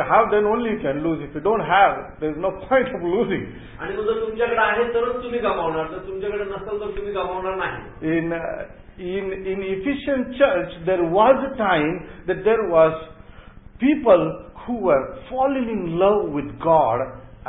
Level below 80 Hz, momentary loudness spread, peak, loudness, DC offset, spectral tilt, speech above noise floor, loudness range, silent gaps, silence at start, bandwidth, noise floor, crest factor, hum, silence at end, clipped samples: -46 dBFS; 12 LU; -4 dBFS; -21 LUFS; under 0.1%; -11 dB/octave; 22 dB; 6 LU; none; 0 s; 4 kHz; -43 dBFS; 18 dB; none; 0 s; under 0.1%